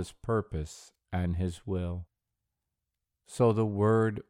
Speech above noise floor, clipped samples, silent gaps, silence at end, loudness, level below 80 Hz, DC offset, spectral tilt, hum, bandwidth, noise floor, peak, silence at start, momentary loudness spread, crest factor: 57 dB; under 0.1%; none; 0.1 s; -30 LUFS; -50 dBFS; under 0.1%; -7.5 dB/octave; none; 11.5 kHz; -86 dBFS; -12 dBFS; 0 s; 16 LU; 18 dB